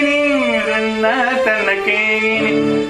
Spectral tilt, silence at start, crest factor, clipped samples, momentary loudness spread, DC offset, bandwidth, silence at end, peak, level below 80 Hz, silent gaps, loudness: -4.5 dB/octave; 0 s; 14 dB; under 0.1%; 2 LU; under 0.1%; 13.5 kHz; 0 s; -2 dBFS; -50 dBFS; none; -15 LUFS